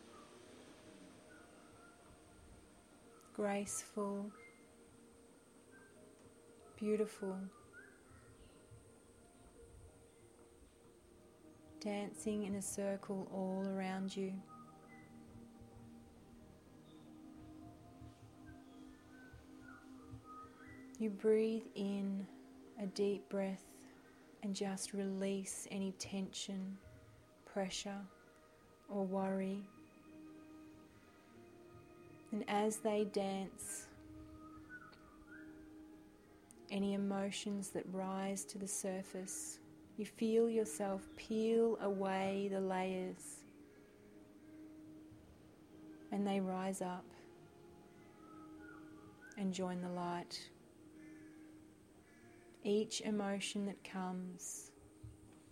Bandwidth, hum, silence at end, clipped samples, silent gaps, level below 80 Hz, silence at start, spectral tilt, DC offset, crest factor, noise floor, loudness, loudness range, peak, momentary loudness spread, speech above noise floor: 16 kHz; none; 0 s; under 0.1%; none; -74 dBFS; 0 s; -5 dB/octave; under 0.1%; 20 dB; -65 dBFS; -41 LUFS; 18 LU; -24 dBFS; 24 LU; 25 dB